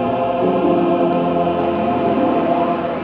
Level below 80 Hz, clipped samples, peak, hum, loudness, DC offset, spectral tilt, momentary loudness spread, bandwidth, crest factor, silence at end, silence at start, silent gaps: -48 dBFS; under 0.1%; -4 dBFS; none; -17 LUFS; under 0.1%; -9.5 dB/octave; 2 LU; 5.2 kHz; 12 dB; 0 s; 0 s; none